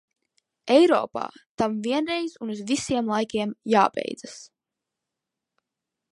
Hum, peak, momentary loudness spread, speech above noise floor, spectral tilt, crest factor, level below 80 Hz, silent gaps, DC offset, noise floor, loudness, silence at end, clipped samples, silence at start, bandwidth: none; -4 dBFS; 17 LU; 62 dB; -4.5 dB/octave; 22 dB; -64 dBFS; 1.46-1.58 s; under 0.1%; -86 dBFS; -24 LUFS; 1.65 s; under 0.1%; 0.65 s; 11.5 kHz